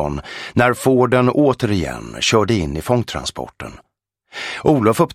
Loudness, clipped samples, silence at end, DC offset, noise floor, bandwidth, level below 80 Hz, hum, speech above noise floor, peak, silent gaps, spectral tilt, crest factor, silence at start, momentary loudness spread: -17 LUFS; under 0.1%; 0 s; under 0.1%; -55 dBFS; 16 kHz; -40 dBFS; none; 38 dB; 0 dBFS; none; -5.5 dB/octave; 18 dB; 0 s; 15 LU